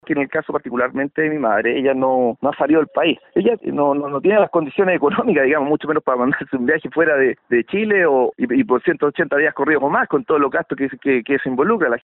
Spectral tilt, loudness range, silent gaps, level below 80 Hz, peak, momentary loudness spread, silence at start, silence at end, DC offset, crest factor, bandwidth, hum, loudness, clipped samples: -4 dB/octave; 1 LU; none; -58 dBFS; -2 dBFS; 5 LU; 0.05 s; 0.05 s; under 0.1%; 14 dB; 4.1 kHz; none; -18 LUFS; under 0.1%